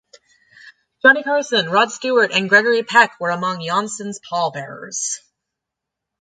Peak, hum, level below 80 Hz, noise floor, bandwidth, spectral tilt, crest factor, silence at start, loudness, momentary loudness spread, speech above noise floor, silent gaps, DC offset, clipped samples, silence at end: 0 dBFS; none; -72 dBFS; -83 dBFS; 9.6 kHz; -2.5 dB/octave; 20 dB; 0.65 s; -17 LUFS; 13 LU; 65 dB; none; under 0.1%; under 0.1%; 1.05 s